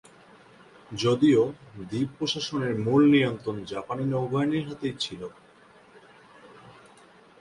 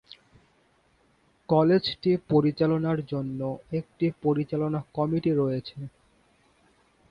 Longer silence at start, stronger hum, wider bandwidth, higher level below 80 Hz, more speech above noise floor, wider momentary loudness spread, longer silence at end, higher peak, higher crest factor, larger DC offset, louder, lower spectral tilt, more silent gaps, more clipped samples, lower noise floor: second, 0.9 s vs 1.5 s; neither; first, 11 kHz vs 5.4 kHz; about the same, -62 dBFS vs -60 dBFS; second, 30 dB vs 40 dB; first, 14 LU vs 11 LU; second, 0.7 s vs 1.2 s; about the same, -10 dBFS vs -8 dBFS; about the same, 18 dB vs 20 dB; neither; about the same, -26 LUFS vs -26 LUFS; second, -6 dB/octave vs -9 dB/octave; neither; neither; second, -55 dBFS vs -65 dBFS